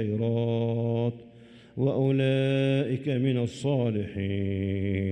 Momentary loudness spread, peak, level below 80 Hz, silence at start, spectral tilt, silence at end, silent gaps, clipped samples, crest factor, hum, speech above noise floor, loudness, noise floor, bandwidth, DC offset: 6 LU; -14 dBFS; -64 dBFS; 0 s; -8 dB/octave; 0 s; none; under 0.1%; 12 dB; none; 25 dB; -27 LUFS; -51 dBFS; 9.2 kHz; under 0.1%